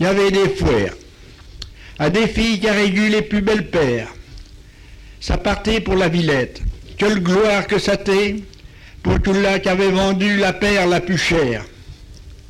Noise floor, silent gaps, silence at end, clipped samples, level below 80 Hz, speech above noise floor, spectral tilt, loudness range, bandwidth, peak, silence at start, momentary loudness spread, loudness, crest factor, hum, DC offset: -41 dBFS; none; 0.15 s; under 0.1%; -32 dBFS; 24 dB; -5.5 dB/octave; 3 LU; 14 kHz; -6 dBFS; 0 s; 12 LU; -17 LUFS; 12 dB; none; under 0.1%